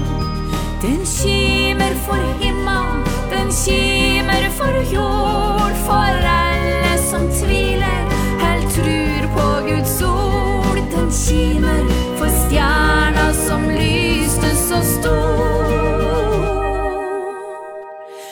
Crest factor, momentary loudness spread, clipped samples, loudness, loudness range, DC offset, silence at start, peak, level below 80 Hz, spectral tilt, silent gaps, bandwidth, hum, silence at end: 14 dB; 6 LU; under 0.1%; -17 LUFS; 2 LU; under 0.1%; 0 s; -2 dBFS; -22 dBFS; -4.5 dB/octave; none; over 20 kHz; none; 0 s